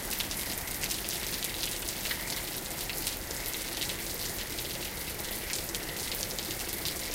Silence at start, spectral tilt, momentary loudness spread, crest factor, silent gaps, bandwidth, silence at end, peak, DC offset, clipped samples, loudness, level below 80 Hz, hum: 0 s; -1.5 dB/octave; 3 LU; 24 dB; none; 16.5 kHz; 0 s; -10 dBFS; under 0.1%; under 0.1%; -33 LUFS; -48 dBFS; none